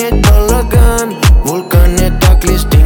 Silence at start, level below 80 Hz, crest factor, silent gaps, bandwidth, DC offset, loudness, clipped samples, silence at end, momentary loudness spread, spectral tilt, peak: 0 s; -10 dBFS; 8 dB; none; 19 kHz; under 0.1%; -10 LUFS; under 0.1%; 0 s; 3 LU; -5.5 dB/octave; 0 dBFS